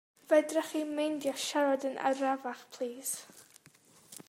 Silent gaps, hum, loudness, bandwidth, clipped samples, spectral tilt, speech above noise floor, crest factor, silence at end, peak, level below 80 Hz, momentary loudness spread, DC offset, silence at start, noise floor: none; none; -32 LUFS; 16 kHz; under 0.1%; -2 dB/octave; 30 dB; 20 dB; 0.05 s; -14 dBFS; -86 dBFS; 12 LU; under 0.1%; 0.3 s; -62 dBFS